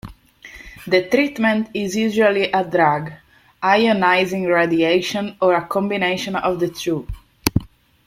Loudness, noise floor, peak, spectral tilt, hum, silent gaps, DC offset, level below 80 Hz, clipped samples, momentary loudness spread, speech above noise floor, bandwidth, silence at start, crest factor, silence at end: -18 LUFS; -42 dBFS; 0 dBFS; -5 dB/octave; none; none; under 0.1%; -44 dBFS; under 0.1%; 9 LU; 24 dB; 16.5 kHz; 0.05 s; 20 dB; 0.4 s